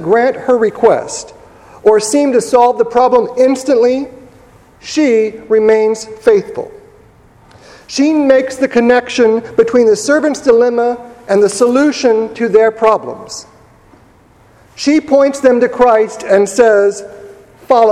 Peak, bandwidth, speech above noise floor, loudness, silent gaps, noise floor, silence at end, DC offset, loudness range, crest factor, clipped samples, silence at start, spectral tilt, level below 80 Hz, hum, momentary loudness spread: 0 dBFS; 12.5 kHz; 35 dB; -11 LUFS; none; -45 dBFS; 0 s; under 0.1%; 3 LU; 12 dB; 0.2%; 0 s; -4 dB/octave; -50 dBFS; none; 11 LU